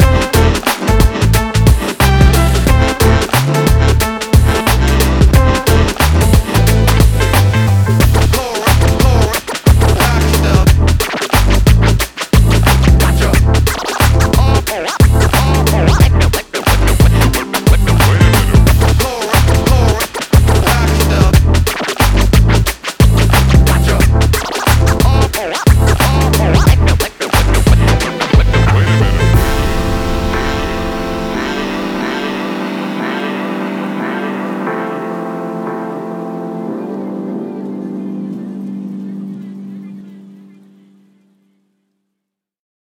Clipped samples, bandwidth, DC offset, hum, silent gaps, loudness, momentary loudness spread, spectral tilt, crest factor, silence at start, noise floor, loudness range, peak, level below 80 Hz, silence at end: under 0.1%; 20 kHz; under 0.1%; none; none; -12 LUFS; 12 LU; -5.5 dB/octave; 10 dB; 0 s; -77 dBFS; 11 LU; 0 dBFS; -14 dBFS; 2.65 s